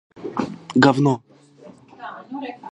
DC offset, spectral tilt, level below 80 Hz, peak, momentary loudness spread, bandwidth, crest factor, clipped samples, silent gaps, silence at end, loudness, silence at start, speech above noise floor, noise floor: under 0.1%; -6.5 dB/octave; -64 dBFS; 0 dBFS; 21 LU; 9.8 kHz; 22 dB; under 0.1%; none; 0.05 s; -20 LUFS; 0.15 s; 27 dB; -46 dBFS